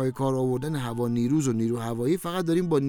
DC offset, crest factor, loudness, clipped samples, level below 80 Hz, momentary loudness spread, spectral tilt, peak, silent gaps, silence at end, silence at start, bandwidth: under 0.1%; 14 dB; -26 LUFS; under 0.1%; -58 dBFS; 4 LU; -7 dB/octave; -12 dBFS; none; 0 s; 0 s; 19.5 kHz